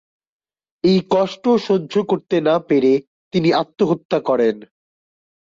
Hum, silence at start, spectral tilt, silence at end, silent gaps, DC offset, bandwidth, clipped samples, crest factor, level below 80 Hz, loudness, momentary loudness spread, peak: none; 0.85 s; -7 dB/octave; 0.8 s; 3.07-3.31 s, 4.05-4.09 s; under 0.1%; 7.6 kHz; under 0.1%; 14 dB; -58 dBFS; -18 LUFS; 5 LU; -6 dBFS